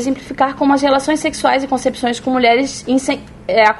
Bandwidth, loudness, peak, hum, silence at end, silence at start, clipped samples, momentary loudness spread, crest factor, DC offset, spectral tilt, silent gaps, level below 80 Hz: 11.5 kHz; -16 LUFS; 0 dBFS; none; 0 s; 0 s; under 0.1%; 6 LU; 16 dB; under 0.1%; -3.5 dB/octave; none; -44 dBFS